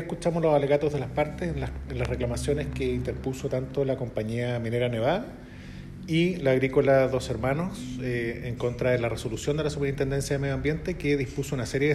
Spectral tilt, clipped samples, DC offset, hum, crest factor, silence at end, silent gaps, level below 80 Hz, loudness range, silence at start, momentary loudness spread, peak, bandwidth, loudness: -6.5 dB/octave; under 0.1%; under 0.1%; none; 18 dB; 0 s; none; -42 dBFS; 4 LU; 0 s; 9 LU; -10 dBFS; 13.5 kHz; -27 LUFS